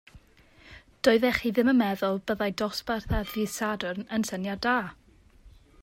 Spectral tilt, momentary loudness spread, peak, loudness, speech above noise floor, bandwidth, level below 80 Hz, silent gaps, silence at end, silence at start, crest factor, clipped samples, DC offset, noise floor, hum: -5 dB/octave; 8 LU; -8 dBFS; -27 LUFS; 30 dB; 16 kHz; -46 dBFS; none; 0.35 s; 0.15 s; 20 dB; under 0.1%; under 0.1%; -57 dBFS; none